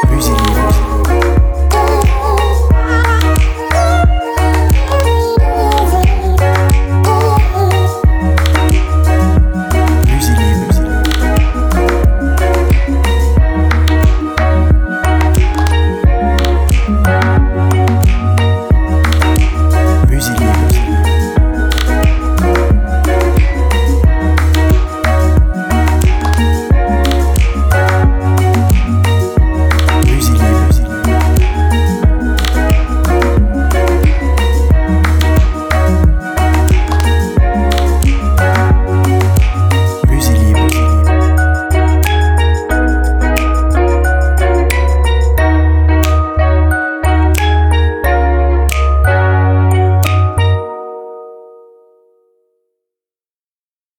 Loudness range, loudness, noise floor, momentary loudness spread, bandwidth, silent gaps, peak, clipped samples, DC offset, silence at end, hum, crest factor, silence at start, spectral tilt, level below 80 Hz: 1 LU; -12 LUFS; under -90 dBFS; 2 LU; 18.5 kHz; none; 0 dBFS; under 0.1%; under 0.1%; 2.55 s; none; 10 dB; 0 s; -6 dB/octave; -12 dBFS